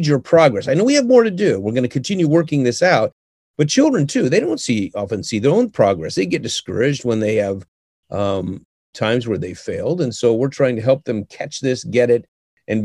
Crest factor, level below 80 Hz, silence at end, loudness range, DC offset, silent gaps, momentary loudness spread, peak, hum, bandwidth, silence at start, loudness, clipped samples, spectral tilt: 16 dB; -56 dBFS; 0 s; 5 LU; under 0.1%; 3.12-3.54 s, 7.68-8.03 s, 8.65-8.93 s, 12.28-12.57 s; 10 LU; 0 dBFS; none; 12 kHz; 0 s; -17 LUFS; under 0.1%; -5.5 dB/octave